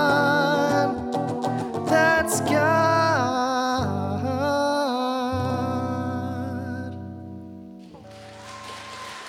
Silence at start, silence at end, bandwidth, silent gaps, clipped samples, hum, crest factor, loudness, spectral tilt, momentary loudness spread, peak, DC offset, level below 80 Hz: 0 s; 0 s; 18 kHz; none; under 0.1%; none; 18 dB; -23 LUFS; -5 dB/octave; 21 LU; -6 dBFS; under 0.1%; -56 dBFS